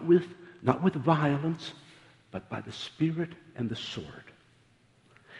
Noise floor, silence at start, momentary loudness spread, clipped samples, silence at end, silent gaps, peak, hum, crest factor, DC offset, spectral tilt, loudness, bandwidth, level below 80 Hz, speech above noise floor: -64 dBFS; 0 s; 18 LU; under 0.1%; 0 s; none; -6 dBFS; none; 24 dB; under 0.1%; -7.5 dB/octave; -30 LUFS; 10.5 kHz; -66 dBFS; 34 dB